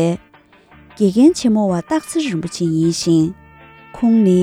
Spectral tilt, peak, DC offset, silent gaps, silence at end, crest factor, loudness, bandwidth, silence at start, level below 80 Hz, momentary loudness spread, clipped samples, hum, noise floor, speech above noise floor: -6.5 dB/octave; -2 dBFS; under 0.1%; none; 0 s; 14 dB; -16 LUFS; 15 kHz; 0 s; -50 dBFS; 8 LU; under 0.1%; none; -48 dBFS; 33 dB